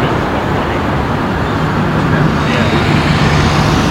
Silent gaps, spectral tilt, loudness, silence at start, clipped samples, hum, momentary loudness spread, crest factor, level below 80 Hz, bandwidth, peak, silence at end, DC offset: none; -6 dB/octave; -13 LUFS; 0 s; under 0.1%; none; 4 LU; 12 dB; -26 dBFS; 15.5 kHz; 0 dBFS; 0 s; under 0.1%